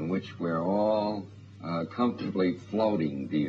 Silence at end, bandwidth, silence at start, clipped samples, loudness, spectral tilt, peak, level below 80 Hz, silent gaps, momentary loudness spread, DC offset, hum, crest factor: 0 s; 7.4 kHz; 0 s; under 0.1%; -29 LUFS; -8.5 dB/octave; -14 dBFS; -68 dBFS; none; 9 LU; under 0.1%; none; 14 dB